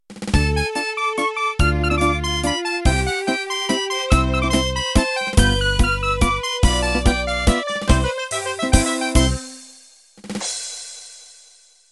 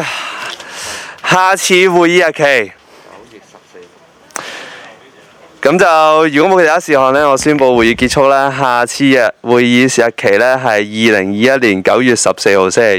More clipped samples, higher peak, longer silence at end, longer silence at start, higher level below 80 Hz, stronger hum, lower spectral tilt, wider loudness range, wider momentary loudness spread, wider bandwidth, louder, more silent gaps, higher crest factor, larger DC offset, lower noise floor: neither; about the same, 0 dBFS vs 0 dBFS; first, 0.65 s vs 0 s; about the same, 0.1 s vs 0 s; first, -24 dBFS vs -46 dBFS; neither; about the same, -4 dB/octave vs -4 dB/octave; about the same, 4 LU vs 6 LU; second, 8 LU vs 15 LU; second, 12.5 kHz vs 19 kHz; second, -19 LUFS vs -10 LUFS; neither; first, 20 dB vs 12 dB; neither; first, -51 dBFS vs -43 dBFS